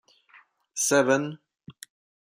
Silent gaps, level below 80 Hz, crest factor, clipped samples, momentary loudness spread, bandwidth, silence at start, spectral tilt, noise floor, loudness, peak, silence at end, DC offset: none; -76 dBFS; 20 dB; under 0.1%; 25 LU; 15.5 kHz; 0.75 s; -3 dB/octave; -58 dBFS; -24 LUFS; -8 dBFS; 0.6 s; under 0.1%